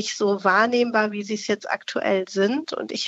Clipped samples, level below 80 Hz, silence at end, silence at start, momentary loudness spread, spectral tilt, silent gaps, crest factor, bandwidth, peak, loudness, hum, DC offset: under 0.1%; -76 dBFS; 0 s; 0 s; 8 LU; -4 dB/octave; none; 18 dB; 8.2 kHz; -4 dBFS; -22 LUFS; none; under 0.1%